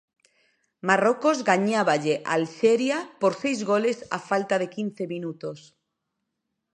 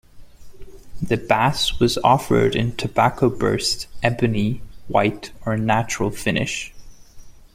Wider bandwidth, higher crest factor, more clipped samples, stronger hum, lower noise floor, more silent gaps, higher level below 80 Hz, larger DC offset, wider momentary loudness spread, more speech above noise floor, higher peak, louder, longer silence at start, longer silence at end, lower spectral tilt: second, 10 kHz vs 16 kHz; about the same, 22 dB vs 20 dB; neither; neither; first, -81 dBFS vs -40 dBFS; neither; second, -76 dBFS vs -40 dBFS; neither; first, 11 LU vs 8 LU; first, 57 dB vs 20 dB; about the same, -4 dBFS vs -2 dBFS; second, -24 LUFS vs -20 LUFS; first, 0.85 s vs 0.15 s; first, 1.15 s vs 0.15 s; about the same, -5 dB/octave vs -5 dB/octave